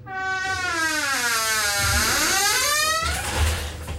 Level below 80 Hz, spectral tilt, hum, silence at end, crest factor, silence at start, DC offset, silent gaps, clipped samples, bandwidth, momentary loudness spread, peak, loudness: -34 dBFS; -1.5 dB/octave; none; 0 s; 14 dB; 0 s; under 0.1%; none; under 0.1%; 16 kHz; 6 LU; -8 dBFS; -21 LUFS